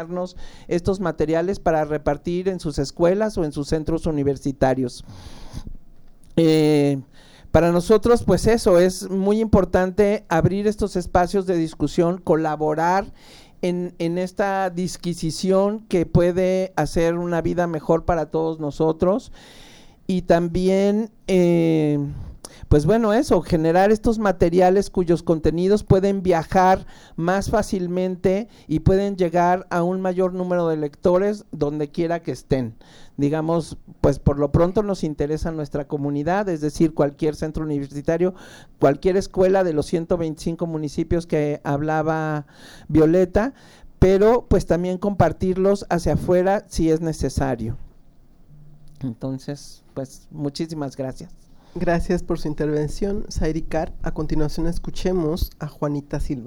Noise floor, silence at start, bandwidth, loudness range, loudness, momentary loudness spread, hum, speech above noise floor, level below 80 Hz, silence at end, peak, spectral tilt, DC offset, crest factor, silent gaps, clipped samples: -48 dBFS; 0 s; over 20 kHz; 7 LU; -21 LUFS; 11 LU; none; 28 dB; -34 dBFS; 0 s; -2 dBFS; -7 dB/octave; under 0.1%; 18 dB; none; under 0.1%